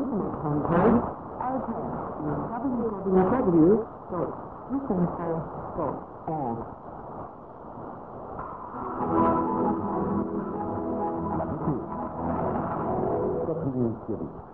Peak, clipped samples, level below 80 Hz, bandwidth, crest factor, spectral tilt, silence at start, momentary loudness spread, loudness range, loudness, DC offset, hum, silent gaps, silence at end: -10 dBFS; under 0.1%; -48 dBFS; 3.7 kHz; 18 dB; -12.5 dB/octave; 0 s; 17 LU; 8 LU; -28 LUFS; 0.1%; none; none; 0 s